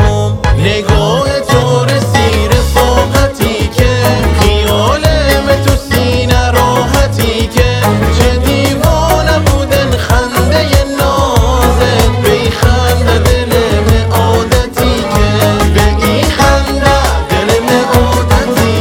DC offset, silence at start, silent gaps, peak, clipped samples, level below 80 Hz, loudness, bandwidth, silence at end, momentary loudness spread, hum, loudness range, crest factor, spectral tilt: under 0.1%; 0 s; none; 0 dBFS; 1%; -16 dBFS; -10 LUFS; 18.5 kHz; 0 s; 2 LU; none; 1 LU; 10 dB; -5 dB/octave